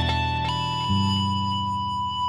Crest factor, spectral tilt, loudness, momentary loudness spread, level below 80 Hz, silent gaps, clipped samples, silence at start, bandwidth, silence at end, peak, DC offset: 14 dB; -5 dB/octave; -24 LUFS; 4 LU; -40 dBFS; none; under 0.1%; 0 s; 11.5 kHz; 0 s; -10 dBFS; under 0.1%